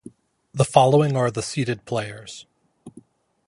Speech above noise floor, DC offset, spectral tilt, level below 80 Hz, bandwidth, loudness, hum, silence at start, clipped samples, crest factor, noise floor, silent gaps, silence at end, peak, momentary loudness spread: 31 dB; under 0.1%; -6 dB/octave; -58 dBFS; 11.5 kHz; -21 LUFS; none; 0.55 s; under 0.1%; 22 dB; -51 dBFS; none; 0.6 s; -2 dBFS; 21 LU